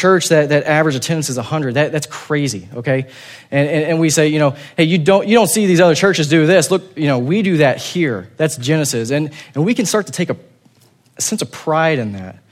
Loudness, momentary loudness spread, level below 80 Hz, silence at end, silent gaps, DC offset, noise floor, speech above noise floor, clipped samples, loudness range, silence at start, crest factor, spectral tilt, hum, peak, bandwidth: -15 LUFS; 10 LU; -60 dBFS; 0.2 s; none; under 0.1%; -52 dBFS; 37 dB; under 0.1%; 6 LU; 0 s; 14 dB; -5 dB/octave; none; 0 dBFS; 16 kHz